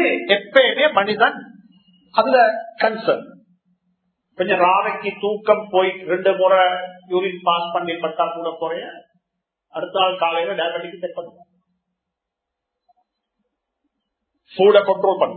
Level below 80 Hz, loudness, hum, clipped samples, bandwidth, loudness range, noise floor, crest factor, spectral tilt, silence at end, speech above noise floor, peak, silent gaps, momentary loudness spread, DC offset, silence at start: -76 dBFS; -18 LUFS; none; under 0.1%; 4.5 kHz; 7 LU; -82 dBFS; 20 dB; -7.5 dB/octave; 0 s; 64 dB; 0 dBFS; none; 14 LU; under 0.1%; 0 s